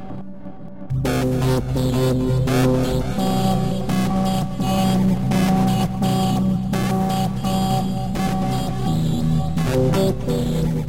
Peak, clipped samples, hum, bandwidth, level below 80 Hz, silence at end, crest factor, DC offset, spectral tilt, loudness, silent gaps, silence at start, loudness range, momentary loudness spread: -8 dBFS; under 0.1%; none; 16.5 kHz; -34 dBFS; 0 s; 12 dB; 2%; -6.5 dB/octave; -20 LUFS; none; 0 s; 2 LU; 5 LU